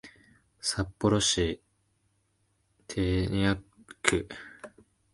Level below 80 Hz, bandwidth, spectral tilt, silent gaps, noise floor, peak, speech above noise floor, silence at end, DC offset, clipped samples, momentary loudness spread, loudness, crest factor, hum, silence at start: -46 dBFS; 11.5 kHz; -4 dB/octave; none; -73 dBFS; -2 dBFS; 45 dB; 0.45 s; under 0.1%; under 0.1%; 19 LU; -29 LUFS; 28 dB; none; 0.05 s